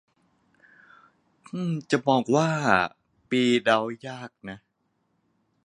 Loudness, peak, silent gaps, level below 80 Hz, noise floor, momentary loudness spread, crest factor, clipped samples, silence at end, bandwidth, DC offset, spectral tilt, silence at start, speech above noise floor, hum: -24 LUFS; -4 dBFS; none; -66 dBFS; -73 dBFS; 18 LU; 24 dB; under 0.1%; 1.1 s; 10.5 kHz; under 0.1%; -5.5 dB/octave; 1.55 s; 49 dB; none